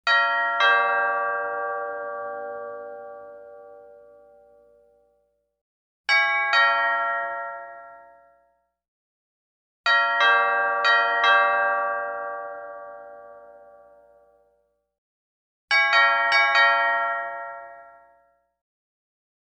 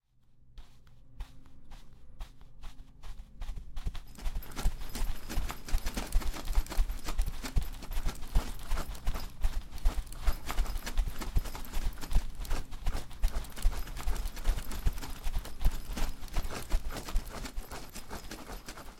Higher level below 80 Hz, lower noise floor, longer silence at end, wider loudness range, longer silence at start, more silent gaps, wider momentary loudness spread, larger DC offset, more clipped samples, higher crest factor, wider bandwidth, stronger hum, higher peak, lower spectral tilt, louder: second, -76 dBFS vs -34 dBFS; first, -70 dBFS vs -59 dBFS; first, 1.7 s vs 0 s; first, 15 LU vs 9 LU; second, 0.05 s vs 0.45 s; first, 5.61-6.04 s, 8.88-9.84 s, 14.98-15.68 s vs none; first, 20 LU vs 15 LU; neither; neither; about the same, 18 dB vs 18 dB; second, 9 kHz vs 16.5 kHz; neither; first, -6 dBFS vs -14 dBFS; second, -0.5 dB/octave vs -4 dB/octave; first, -20 LUFS vs -39 LUFS